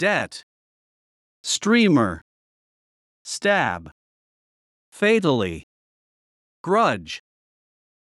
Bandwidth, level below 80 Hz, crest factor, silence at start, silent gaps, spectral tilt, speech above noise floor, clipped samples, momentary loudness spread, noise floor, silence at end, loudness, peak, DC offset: 12 kHz; -60 dBFS; 18 dB; 0 s; 0.43-1.44 s, 2.22-3.25 s, 3.92-4.92 s, 5.63-6.64 s; -4.5 dB/octave; over 69 dB; under 0.1%; 19 LU; under -90 dBFS; 1 s; -21 LUFS; -6 dBFS; under 0.1%